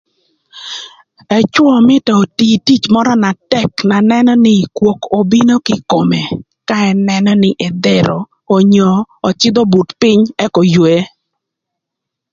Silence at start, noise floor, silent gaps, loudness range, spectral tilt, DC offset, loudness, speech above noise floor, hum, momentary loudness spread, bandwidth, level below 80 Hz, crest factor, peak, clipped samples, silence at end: 0.55 s; -79 dBFS; none; 2 LU; -6 dB/octave; under 0.1%; -11 LUFS; 69 dB; none; 8 LU; 7.6 kHz; -50 dBFS; 12 dB; 0 dBFS; under 0.1%; 1.25 s